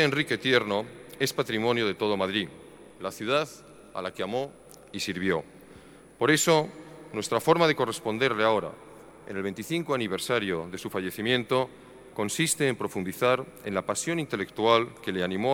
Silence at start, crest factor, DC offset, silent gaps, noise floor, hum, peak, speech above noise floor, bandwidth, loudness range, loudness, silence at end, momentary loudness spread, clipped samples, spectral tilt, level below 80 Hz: 0 s; 22 dB; under 0.1%; none; -51 dBFS; none; -6 dBFS; 23 dB; 18.5 kHz; 6 LU; -27 LUFS; 0 s; 14 LU; under 0.1%; -4 dB/octave; -64 dBFS